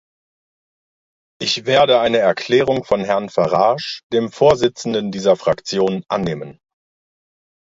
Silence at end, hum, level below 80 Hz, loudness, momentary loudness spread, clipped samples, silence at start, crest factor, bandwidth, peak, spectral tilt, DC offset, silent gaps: 1.2 s; none; -52 dBFS; -17 LUFS; 8 LU; under 0.1%; 1.4 s; 18 dB; 7.8 kHz; 0 dBFS; -5 dB/octave; under 0.1%; 4.03-4.10 s